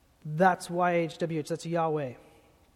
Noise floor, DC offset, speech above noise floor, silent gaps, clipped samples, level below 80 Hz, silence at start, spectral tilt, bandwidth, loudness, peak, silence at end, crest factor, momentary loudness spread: -59 dBFS; under 0.1%; 31 dB; none; under 0.1%; -68 dBFS; 0.25 s; -6 dB/octave; 15.5 kHz; -29 LUFS; -8 dBFS; 0.6 s; 20 dB; 9 LU